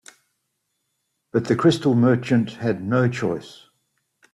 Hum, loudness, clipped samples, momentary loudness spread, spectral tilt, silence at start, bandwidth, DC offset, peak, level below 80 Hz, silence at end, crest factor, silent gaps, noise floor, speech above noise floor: none; -21 LUFS; under 0.1%; 8 LU; -7 dB/octave; 1.35 s; 11.5 kHz; under 0.1%; -4 dBFS; -60 dBFS; 0.8 s; 18 dB; none; -75 dBFS; 55 dB